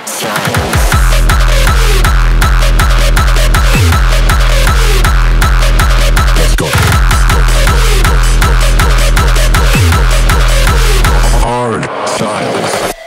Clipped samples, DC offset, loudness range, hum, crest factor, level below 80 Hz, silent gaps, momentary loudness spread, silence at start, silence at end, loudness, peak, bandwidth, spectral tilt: 0.1%; under 0.1%; 1 LU; none; 8 dB; -8 dBFS; none; 4 LU; 0 s; 0 s; -10 LUFS; 0 dBFS; 16.5 kHz; -4 dB/octave